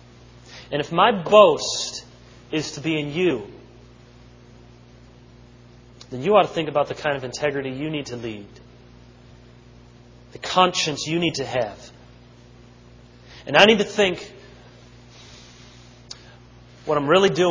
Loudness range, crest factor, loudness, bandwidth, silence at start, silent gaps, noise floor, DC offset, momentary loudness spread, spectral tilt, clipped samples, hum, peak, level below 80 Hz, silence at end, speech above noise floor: 9 LU; 24 dB; -20 LUFS; 8 kHz; 0.45 s; none; -48 dBFS; under 0.1%; 24 LU; -4 dB/octave; under 0.1%; 60 Hz at -50 dBFS; 0 dBFS; -54 dBFS; 0 s; 28 dB